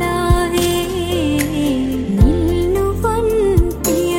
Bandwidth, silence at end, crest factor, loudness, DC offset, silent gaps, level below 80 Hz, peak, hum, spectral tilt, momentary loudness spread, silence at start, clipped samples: 17 kHz; 0 s; 14 dB; -16 LUFS; under 0.1%; none; -22 dBFS; 0 dBFS; none; -5.5 dB/octave; 4 LU; 0 s; under 0.1%